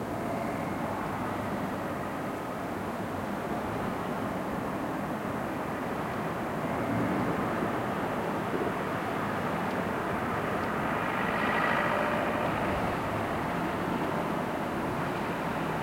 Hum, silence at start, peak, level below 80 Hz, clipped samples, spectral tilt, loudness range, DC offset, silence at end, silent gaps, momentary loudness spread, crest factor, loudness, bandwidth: none; 0 s; -16 dBFS; -54 dBFS; under 0.1%; -6 dB/octave; 5 LU; under 0.1%; 0 s; none; 5 LU; 16 dB; -31 LUFS; 16.5 kHz